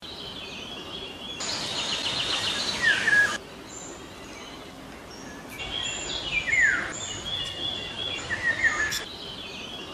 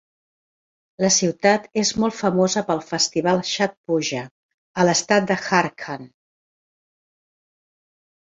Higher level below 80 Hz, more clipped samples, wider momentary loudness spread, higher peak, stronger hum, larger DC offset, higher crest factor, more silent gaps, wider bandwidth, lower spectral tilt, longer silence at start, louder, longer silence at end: first, -52 dBFS vs -60 dBFS; neither; first, 19 LU vs 13 LU; second, -10 dBFS vs -2 dBFS; neither; neither; about the same, 18 dB vs 20 dB; second, none vs 3.77-3.84 s, 4.31-4.74 s; first, 14.5 kHz vs 8 kHz; second, -1 dB/octave vs -3.5 dB/octave; second, 0 s vs 1 s; second, -26 LUFS vs -20 LUFS; second, 0 s vs 2.2 s